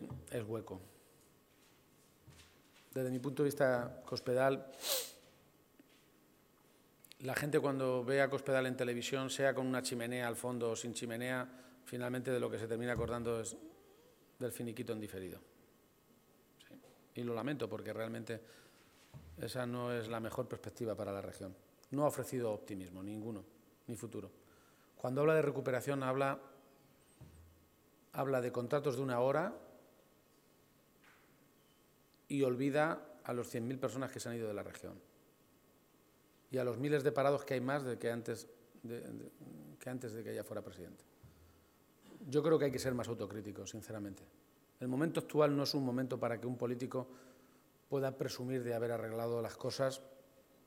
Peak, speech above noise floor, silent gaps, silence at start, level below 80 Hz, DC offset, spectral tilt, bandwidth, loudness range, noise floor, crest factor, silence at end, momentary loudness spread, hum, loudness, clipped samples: -16 dBFS; 31 dB; none; 0 s; -72 dBFS; under 0.1%; -5.5 dB/octave; 16.5 kHz; 8 LU; -69 dBFS; 24 dB; 0.45 s; 16 LU; none; -39 LUFS; under 0.1%